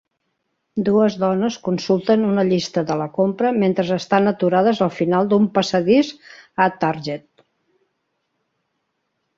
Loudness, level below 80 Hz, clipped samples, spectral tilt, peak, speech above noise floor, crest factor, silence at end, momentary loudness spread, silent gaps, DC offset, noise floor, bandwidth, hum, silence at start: -19 LUFS; -62 dBFS; under 0.1%; -6.5 dB/octave; -2 dBFS; 55 dB; 18 dB; 2.2 s; 7 LU; none; under 0.1%; -73 dBFS; 7.6 kHz; none; 0.75 s